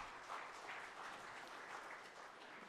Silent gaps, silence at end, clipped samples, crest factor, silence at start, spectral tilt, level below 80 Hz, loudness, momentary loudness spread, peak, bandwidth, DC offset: none; 0 s; under 0.1%; 16 dB; 0 s; -2 dB/octave; -82 dBFS; -52 LUFS; 5 LU; -36 dBFS; 14 kHz; under 0.1%